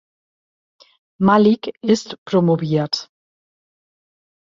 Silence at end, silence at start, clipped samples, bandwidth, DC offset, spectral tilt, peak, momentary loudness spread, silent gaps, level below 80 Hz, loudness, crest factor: 1.45 s; 1.2 s; under 0.1%; 7.6 kHz; under 0.1%; -6.5 dB/octave; -2 dBFS; 8 LU; 2.18-2.26 s; -60 dBFS; -18 LUFS; 18 dB